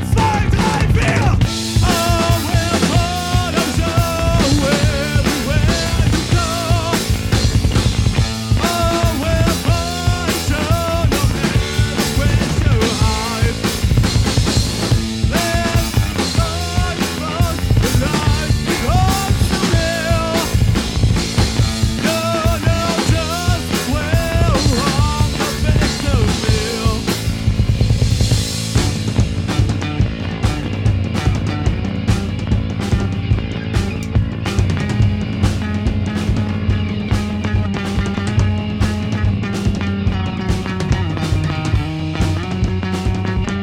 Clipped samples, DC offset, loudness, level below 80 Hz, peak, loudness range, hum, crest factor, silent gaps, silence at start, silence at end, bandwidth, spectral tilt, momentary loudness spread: under 0.1%; under 0.1%; -17 LUFS; -22 dBFS; -2 dBFS; 3 LU; none; 12 dB; none; 0 s; 0 s; 17.5 kHz; -5 dB/octave; 4 LU